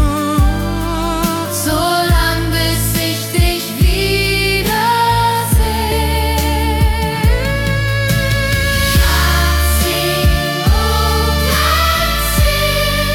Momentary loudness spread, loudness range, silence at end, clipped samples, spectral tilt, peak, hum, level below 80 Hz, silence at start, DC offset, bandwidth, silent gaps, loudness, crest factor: 4 LU; 2 LU; 0 s; under 0.1%; -4 dB/octave; -2 dBFS; none; -18 dBFS; 0 s; under 0.1%; 18 kHz; none; -14 LUFS; 12 dB